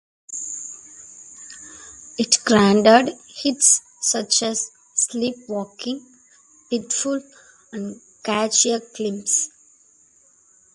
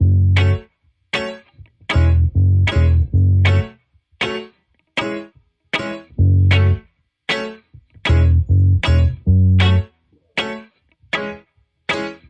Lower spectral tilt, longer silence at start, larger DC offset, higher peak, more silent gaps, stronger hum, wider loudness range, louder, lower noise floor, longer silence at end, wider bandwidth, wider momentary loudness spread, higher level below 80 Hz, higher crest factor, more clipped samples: second, -2.5 dB/octave vs -7 dB/octave; first, 0.3 s vs 0 s; neither; about the same, 0 dBFS vs -2 dBFS; neither; neither; first, 9 LU vs 3 LU; about the same, -19 LUFS vs -17 LUFS; about the same, -56 dBFS vs -57 dBFS; first, 1.3 s vs 0.15 s; first, 11.5 kHz vs 7.8 kHz; first, 23 LU vs 16 LU; second, -62 dBFS vs -30 dBFS; first, 22 dB vs 14 dB; neither